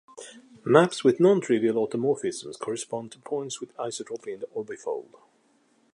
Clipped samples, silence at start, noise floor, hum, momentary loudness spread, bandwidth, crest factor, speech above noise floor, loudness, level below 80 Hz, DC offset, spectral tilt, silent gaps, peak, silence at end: under 0.1%; 0.15 s; -65 dBFS; none; 16 LU; 11.5 kHz; 24 dB; 39 dB; -26 LUFS; -76 dBFS; under 0.1%; -5.5 dB/octave; none; -2 dBFS; 0.9 s